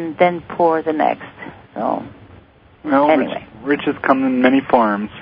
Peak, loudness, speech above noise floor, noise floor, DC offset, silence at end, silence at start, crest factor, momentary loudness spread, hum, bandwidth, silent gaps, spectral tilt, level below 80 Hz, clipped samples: 0 dBFS; -17 LUFS; 30 dB; -46 dBFS; under 0.1%; 0 s; 0 s; 18 dB; 16 LU; none; 5.2 kHz; none; -9.5 dB/octave; -54 dBFS; under 0.1%